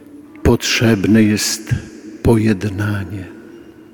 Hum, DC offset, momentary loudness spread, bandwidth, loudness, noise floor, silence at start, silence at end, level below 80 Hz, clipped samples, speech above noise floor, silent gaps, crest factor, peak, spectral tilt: none; under 0.1%; 16 LU; 19 kHz; -16 LUFS; -39 dBFS; 0.15 s; 0.2 s; -34 dBFS; under 0.1%; 23 dB; none; 16 dB; -2 dBFS; -5 dB/octave